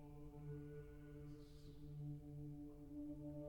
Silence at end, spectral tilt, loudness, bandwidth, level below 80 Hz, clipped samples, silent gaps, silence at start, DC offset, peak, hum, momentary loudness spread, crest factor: 0 s; -9 dB/octave; -55 LUFS; 18 kHz; -64 dBFS; under 0.1%; none; 0 s; under 0.1%; -42 dBFS; none; 6 LU; 12 dB